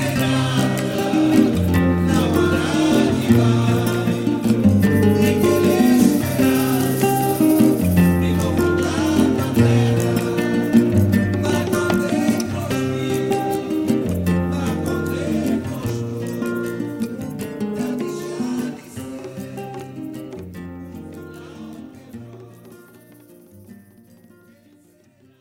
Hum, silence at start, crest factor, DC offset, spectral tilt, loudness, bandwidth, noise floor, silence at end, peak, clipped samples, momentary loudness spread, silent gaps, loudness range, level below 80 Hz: none; 0 s; 16 dB; under 0.1%; -6.5 dB/octave; -18 LUFS; 17 kHz; -54 dBFS; 1.65 s; -2 dBFS; under 0.1%; 17 LU; none; 17 LU; -44 dBFS